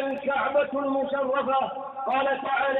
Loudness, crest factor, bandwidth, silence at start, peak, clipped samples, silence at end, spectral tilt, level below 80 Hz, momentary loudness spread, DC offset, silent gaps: -26 LUFS; 12 dB; 4.1 kHz; 0 s; -12 dBFS; under 0.1%; 0 s; -7 dB/octave; -66 dBFS; 3 LU; under 0.1%; none